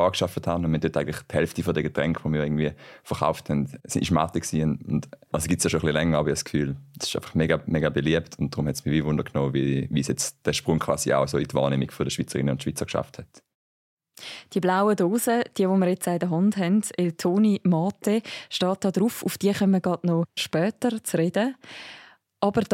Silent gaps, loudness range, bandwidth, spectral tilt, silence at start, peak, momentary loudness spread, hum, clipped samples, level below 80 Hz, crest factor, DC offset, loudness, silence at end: 13.55-13.97 s; 3 LU; 16.5 kHz; -5.5 dB/octave; 0 s; -6 dBFS; 7 LU; none; under 0.1%; -50 dBFS; 18 dB; under 0.1%; -25 LUFS; 0 s